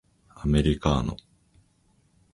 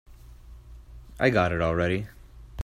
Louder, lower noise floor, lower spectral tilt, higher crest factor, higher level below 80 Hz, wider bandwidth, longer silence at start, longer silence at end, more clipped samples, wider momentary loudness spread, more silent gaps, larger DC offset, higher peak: about the same, -26 LUFS vs -25 LUFS; first, -65 dBFS vs -47 dBFS; about the same, -7 dB/octave vs -7 dB/octave; about the same, 22 dB vs 20 dB; first, -36 dBFS vs -46 dBFS; second, 11.5 kHz vs 14.5 kHz; first, 0.4 s vs 0.1 s; first, 1.2 s vs 0 s; neither; second, 11 LU vs 18 LU; neither; neither; about the same, -6 dBFS vs -8 dBFS